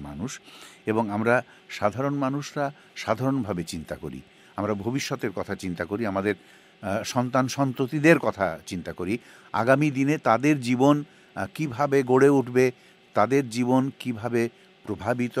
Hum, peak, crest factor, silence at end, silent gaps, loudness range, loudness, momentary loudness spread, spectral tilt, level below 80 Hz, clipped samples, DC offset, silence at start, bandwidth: none; -2 dBFS; 22 dB; 0 s; none; 7 LU; -25 LUFS; 14 LU; -6 dB/octave; -60 dBFS; under 0.1%; under 0.1%; 0 s; 15.5 kHz